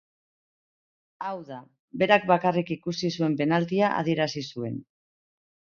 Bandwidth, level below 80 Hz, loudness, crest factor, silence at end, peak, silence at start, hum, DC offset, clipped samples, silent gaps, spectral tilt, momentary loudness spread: 7.2 kHz; -68 dBFS; -26 LUFS; 24 dB; 0.95 s; -4 dBFS; 1.2 s; none; under 0.1%; under 0.1%; 1.79-1.88 s; -6 dB/octave; 16 LU